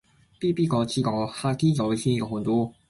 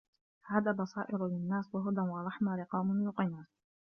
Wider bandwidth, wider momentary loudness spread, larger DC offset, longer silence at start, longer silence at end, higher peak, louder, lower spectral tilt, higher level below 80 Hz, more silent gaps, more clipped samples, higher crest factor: first, 11.5 kHz vs 6.4 kHz; about the same, 4 LU vs 4 LU; neither; about the same, 0.4 s vs 0.45 s; second, 0.2 s vs 0.35 s; first, -10 dBFS vs -16 dBFS; first, -25 LUFS vs -35 LUFS; second, -6.5 dB/octave vs -8 dB/octave; first, -56 dBFS vs -76 dBFS; neither; neither; second, 14 dB vs 20 dB